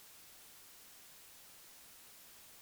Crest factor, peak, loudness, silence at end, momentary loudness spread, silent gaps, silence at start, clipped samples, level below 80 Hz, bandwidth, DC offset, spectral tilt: 4 dB; -52 dBFS; -54 LUFS; 0 s; 0 LU; none; 0 s; under 0.1%; -84 dBFS; over 20 kHz; under 0.1%; 0 dB/octave